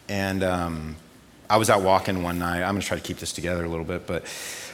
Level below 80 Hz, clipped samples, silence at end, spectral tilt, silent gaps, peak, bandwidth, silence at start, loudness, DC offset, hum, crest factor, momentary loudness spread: -48 dBFS; under 0.1%; 0 s; -4.5 dB/octave; none; -4 dBFS; 17.5 kHz; 0.1 s; -25 LUFS; under 0.1%; none; 22 dB; 13 LU